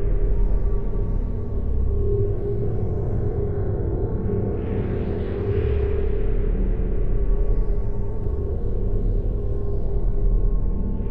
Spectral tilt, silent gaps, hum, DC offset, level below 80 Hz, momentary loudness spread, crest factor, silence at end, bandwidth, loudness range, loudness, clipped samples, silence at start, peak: -11.5 dB/octave; none; none; under 0.1%; -24 dBFS; 4 LU; 12 dB; 0 s; 3.2 kHz; 2 LU; -26 LUFS; under 0.1%; 0 s; -10 dBFS